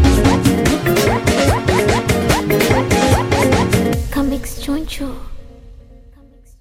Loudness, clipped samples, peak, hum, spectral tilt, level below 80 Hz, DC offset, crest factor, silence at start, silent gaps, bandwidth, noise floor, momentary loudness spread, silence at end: -15 LUFS; under 0.1%; 0 dBFS; none; -5.5 dB/octave; -26 dBFS; under 0.1%; 16 dB; 0 s; none; 16.5 kHz; -44 dBFS; 9 LU; 0.7 s